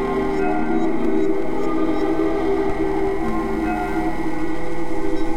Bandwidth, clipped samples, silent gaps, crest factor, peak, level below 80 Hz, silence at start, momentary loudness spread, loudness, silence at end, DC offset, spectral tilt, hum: 12.5 kHz; under 0.1%; none; 12 dB; -6 dBFS; -34 dBFS; 0 s; 5 LU; -22 LUFS; 0 s; under 0.1%; -7 dB/octave; none